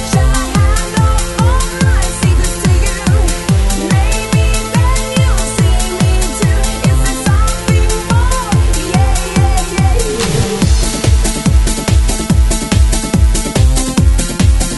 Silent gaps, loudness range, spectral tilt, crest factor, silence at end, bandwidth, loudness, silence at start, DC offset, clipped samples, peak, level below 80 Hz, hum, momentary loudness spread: none; 1 LU; -5 dB/octave; 10 dB; 0 s; 12 kHz; -13 LUFS; 0 s; under 0.1%; under 0.1%; 0 dBFS; -14 dBFS; none; 1 LU